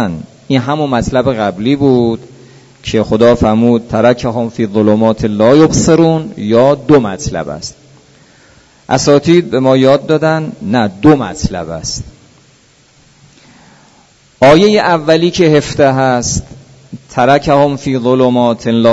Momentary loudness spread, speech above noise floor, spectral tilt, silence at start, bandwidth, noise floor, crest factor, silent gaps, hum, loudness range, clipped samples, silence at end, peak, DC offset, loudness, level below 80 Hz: 11 LU; 37 dB; -5.5 dB/octave; 0 s; 8 kHz; -47 dBFS; 12 dB; none; none; 5 LU; 0.4%; 0 s; 0 dBFS; under 0.1%; -11 LUFS; -36 dBFS